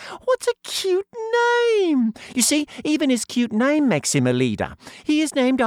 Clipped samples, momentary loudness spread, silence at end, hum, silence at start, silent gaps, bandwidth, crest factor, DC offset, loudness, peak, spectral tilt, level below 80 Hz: under 0.1%; 6 LU; 0 s; none; 0 s; none; 16.5 kHz; 14 dB; under 0.1%; -20 LUFS; -6 dBFS; -4 dB/octave; -58 dBFS